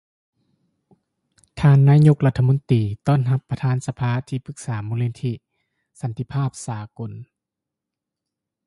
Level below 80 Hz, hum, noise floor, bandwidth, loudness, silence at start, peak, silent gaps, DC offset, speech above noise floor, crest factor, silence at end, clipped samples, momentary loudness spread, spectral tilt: -50 dBFS; none; -85 dBFS; 11.5 kHz; -20 LUFS; 1.55 s; -4 dBFS; none; under 0.1%; 66 dB; 18 dB; 1.45 s; under 0.1%; 19 LU; -8 dB/octave